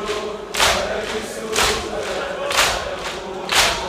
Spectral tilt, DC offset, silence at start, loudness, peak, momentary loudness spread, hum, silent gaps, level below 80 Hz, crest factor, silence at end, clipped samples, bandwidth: -1.5 dB/octave; under 0.1%; 0 s; -20 LUFS; -2 dBFS; 10 LU; none; none; -40 dBFS; 20 dB; 0 s; under 0.1%; 16 kHz